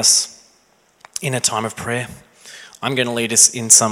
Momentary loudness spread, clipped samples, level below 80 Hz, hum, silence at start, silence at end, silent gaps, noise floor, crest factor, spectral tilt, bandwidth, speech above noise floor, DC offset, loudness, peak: 16 LU; under 0.1%; -58 dBFS; none; 0 s; 0 s; none; -57 dBFS; 18 dB; -1.5 dB/octave; 16.5 kHz; 40 dB; under 0.1%; -16 LUFS; 0 dBFS